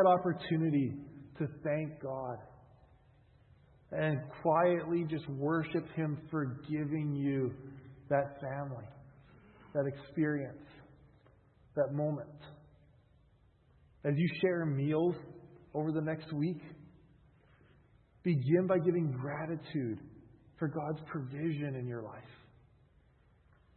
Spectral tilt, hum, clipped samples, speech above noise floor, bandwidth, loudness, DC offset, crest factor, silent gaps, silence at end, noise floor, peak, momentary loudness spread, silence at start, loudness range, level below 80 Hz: -7.5 dB/octave; none; under 0.1%; 33 dB; 4.3 kHz; -35 LUFS; under 0.1%; 22 dB; none; 1.4 s; -66 dBFS; -14 dBFS; 17 LU; 0 s; 7 LU; -68 dBFS